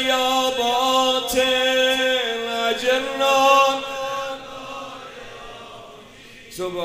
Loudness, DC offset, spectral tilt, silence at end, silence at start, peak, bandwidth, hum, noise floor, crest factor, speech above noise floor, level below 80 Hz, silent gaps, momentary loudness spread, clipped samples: -19 LUFS; under 0.1%; -1.5 dB/octave; 0 s; 0 s; -2 dBFS; 16 kHz; none; -43 dBFS; 18 dB; 23 dB; -54 dBFS; none; 21 LU; under 0.1%